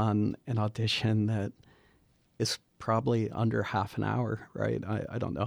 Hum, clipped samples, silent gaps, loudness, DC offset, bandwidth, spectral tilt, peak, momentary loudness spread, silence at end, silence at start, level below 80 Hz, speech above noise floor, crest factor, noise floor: none; under 0.1%; none; -31 LUFS; under 0.1%; 14 kHz; -6 dB/octave; -14 dBFS; 6 LU; 0 s; 0 s; -60 dBFS; 37 dB; 16 dB; -67 dBFS